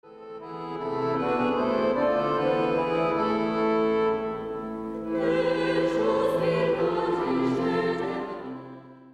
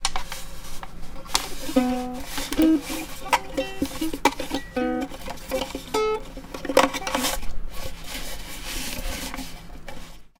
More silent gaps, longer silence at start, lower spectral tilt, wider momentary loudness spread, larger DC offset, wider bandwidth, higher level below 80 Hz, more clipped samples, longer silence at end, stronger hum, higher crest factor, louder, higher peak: neither; about the same, 0.05 s vs 0 s; first, -7 dB/octave vs -3 dB/octave; second, 12 LU vs 18 LU; neither; second, 12 kHz vs 18 kHz; second, -56 dBFS vs -38 dBFS; neither; about the same, 0 s vs 0.1 s; neither; second, 12 dB vs 26 dB; about the same, -26 LUFS vs -26 LUFS; second, -14 dBFS vs 0 dBFS